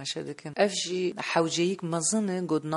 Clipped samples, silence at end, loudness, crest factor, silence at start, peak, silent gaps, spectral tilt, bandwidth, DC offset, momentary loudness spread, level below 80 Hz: under 0.1%; 0 s; -28 LUFS; 20 dB; 0 s; -8 dBFS; none; -4 dB/octave; 11.5 kHz; under 0.1%; 7 LU; -74 dBFS